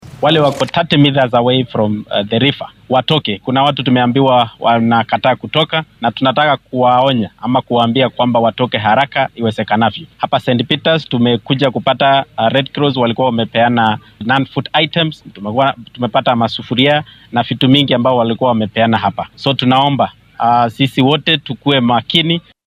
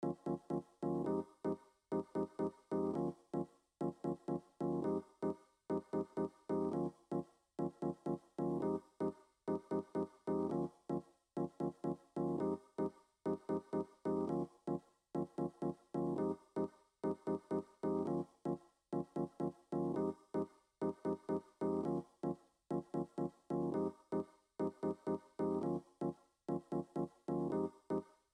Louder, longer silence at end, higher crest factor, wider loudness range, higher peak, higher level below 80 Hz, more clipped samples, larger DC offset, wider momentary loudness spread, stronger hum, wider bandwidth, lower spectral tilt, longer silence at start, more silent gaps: first, -13 LUFS vs -42 LUFS; about the same, 0.3 s vs 0.3 s; about the same, 14 dB vs 14 dB; about the same, 2 LU vs 1 LU; first, 0 dBFS vs -26 dBFS; first, -54 dBFS vs -74 dBFS; neither; neither; about the same, 6 LU vs 6 LU; neither; about the same, 11.5 kHz vs 10.5 kHz; second, -7 dB/octave vs -9.5 dB/octave; about the same, 0.05 s vs 0 s; neither